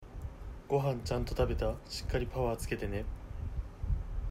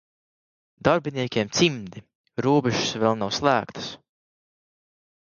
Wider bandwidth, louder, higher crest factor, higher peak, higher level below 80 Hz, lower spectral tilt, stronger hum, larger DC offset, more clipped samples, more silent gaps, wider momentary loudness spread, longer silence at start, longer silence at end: first, 16 kHz vs 7.4 kHz; second, -36 LUFS vs -23 LUFS; about the same, 18 dB vs 22 dB; second, -18 dBFS vs -4 dBFS; first, -40 dBFS vs -58 dBFS; first, -6 dB/octave vs -4.5 dB/octave; neither; neither; neither; second, none vs 2.15-2.24 s; second, 11 LU vs 14 LU; second, 0 s vs 0.85 s; second, 0 s vs 1.35 s